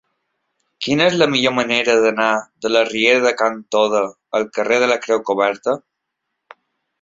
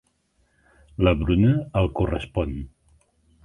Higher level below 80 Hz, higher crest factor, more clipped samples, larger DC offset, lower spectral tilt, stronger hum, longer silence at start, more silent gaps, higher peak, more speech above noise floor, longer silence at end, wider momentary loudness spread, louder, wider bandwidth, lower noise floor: second, -62 dBFS vs -34 dBFS; about the same, 18 dB vs 20 dB; neither; neither; second, -3.5 dB/octave vs -9 dB/octave; neither; second, 0.8 s vs 1 s; neither; first, 0 dBFS vs -4 dBFS; first, 60 dB vs 45 dB; first, 1.25 s vs 0.8 s; second, 8 LU vs 17 LU; first, -17 LUFS vs -23 LUFS; second, 7.8 kHz vs 9.8 kHz; first, -77 dBFS vs -67 dBFS